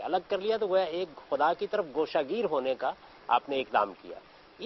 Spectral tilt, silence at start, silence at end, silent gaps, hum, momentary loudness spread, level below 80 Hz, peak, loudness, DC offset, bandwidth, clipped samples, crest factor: -6 dB/octave; 0 s; 0 s; none; none; 8 LU; -68 dBFS; -10 dBFS; -30 LUFS; under 0.1%; 6 kHz; under 0.1%; 20 dB